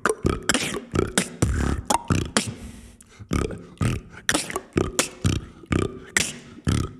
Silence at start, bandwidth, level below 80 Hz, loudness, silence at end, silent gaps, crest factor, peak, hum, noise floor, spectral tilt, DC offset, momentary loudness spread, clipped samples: 0.05 s; 15.5 kHz; -36 dBFS; -25 LUFS; 0 s; none; 24 dB; -2 dBFS; none; -45 dBFS; -4 dB/octave; under 0.1%; 6 LU; under 0.1%